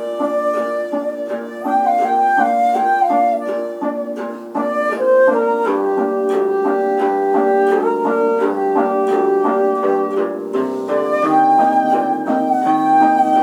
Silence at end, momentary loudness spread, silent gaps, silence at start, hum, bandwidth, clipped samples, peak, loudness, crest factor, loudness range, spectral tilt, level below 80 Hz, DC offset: 0 s; 9 LU; none; 0 s; none; 13.5 kHz; under 0.1%; -2 dBFS; -16 LUFS; 12 dB; 1 LU; -6 dB/octave; -72 dBFS; under 0.1%